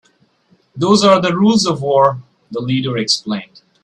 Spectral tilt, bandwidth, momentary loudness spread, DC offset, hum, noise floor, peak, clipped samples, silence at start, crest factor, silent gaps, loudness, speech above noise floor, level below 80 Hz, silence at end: -5 dB/octave; 11 kHz; 14 LU; under 0.1%; none; -56 dBFS; 0 dBFS; under 0.1%; 0.75 s; 16 dB; none; -14 LUFS; 42 dB; -56 dBFS; 0.4 s